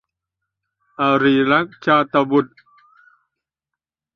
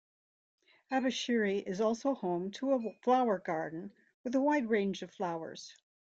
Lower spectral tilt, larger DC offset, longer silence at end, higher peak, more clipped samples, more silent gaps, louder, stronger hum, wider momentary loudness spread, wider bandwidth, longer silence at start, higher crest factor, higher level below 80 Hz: first, -7.5 dB/octave vs -5 dB/octave; neither; first, 1.7 s vs 0.45 s; first, -2 dBFS vs -18 dBFS; neither; second, none vs 4.14-4.24 s; first, -17 LUFS vs -33 LUFS; neither; second, 6 LU vs 15 LU; second, 6.4 kHz vs 8 kHz; about the same, 1 s vs 0.9 s; about the same, 18 dB vs 16 dB; first, -62 dBFS vs -78 dBFS